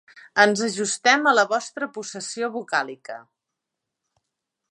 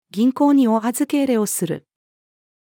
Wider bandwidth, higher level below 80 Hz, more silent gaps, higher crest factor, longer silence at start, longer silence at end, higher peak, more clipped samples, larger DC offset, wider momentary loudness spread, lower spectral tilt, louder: second, 11.5 kHz vs 18 kHz; about the same, -78 dBFS vs -74 dBFS; neither; first, 22 dB vs 14 dB; about the same, 0.15 s vs 0.15 s; first, 1.5 s vs 0.85 s; first, -2 dBFS vs -6 dBFS; neither; neither; first, 15 LU vs 9 LU; second, -2 dB/octave vs -5 dB/octave; second, -22 LUFS vs -18 LUFS